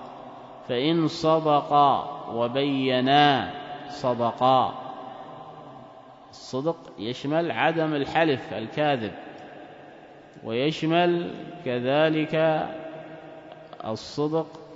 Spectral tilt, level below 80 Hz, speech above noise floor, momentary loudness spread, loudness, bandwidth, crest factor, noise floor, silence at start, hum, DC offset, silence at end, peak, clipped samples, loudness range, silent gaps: -6 dB/octave; -66 dBFS; 23 dB; 22 LU; -24 LUFS; 7.8 kHz; 20 dB; -47 dBFS; 0 s; none; under 0.1%; 0 s; -4 dBFS; under 0.1%; 6 LU; none